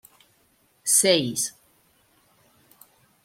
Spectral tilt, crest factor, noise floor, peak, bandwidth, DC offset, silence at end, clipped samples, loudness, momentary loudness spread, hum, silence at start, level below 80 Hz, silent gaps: -2 dB/octave; 22 dB; -64 dBFS; -6 dBFS; 16.5 kHz; under 0.1%; 1.75 s; under 0.1%; -21 LUFS; 13 LU; none; 0.85 s; -70 dBFS; none